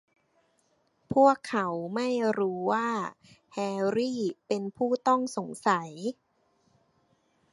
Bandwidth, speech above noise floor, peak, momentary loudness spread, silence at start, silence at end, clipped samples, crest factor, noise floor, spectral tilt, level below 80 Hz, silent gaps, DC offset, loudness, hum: 11.5 kHz; 43 dB; -8 dBFS; 12 LU; 1.1 s; 1.4 s; under 0.1%; 22 dB; -71 dBFS; -5.5 dB/octave; -72 dBFS; none; under 0.1%; -28 LUFS; none